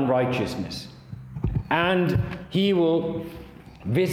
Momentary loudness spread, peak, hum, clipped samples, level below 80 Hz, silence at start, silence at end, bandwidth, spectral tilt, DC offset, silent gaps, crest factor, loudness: 18 LU; -8 dBFS; none; under 0.1%; -44 dBFS; 0 s; 0 s; 15.5 kHz; -7 dB/octave; under 0.1%; none; 18 dB; -25 LUFS